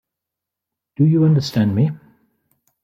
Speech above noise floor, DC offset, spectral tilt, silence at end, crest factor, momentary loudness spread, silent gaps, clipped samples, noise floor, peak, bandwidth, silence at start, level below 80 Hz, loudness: 69 dB; under 0.1%; -8 dB/octave; 0.9 s; 14 dB; 7 LU; none; under 0.1%; -84 dBFS; -4 dBFS; 13 kHz; 1 s; -60 dBFS; -17 LUFS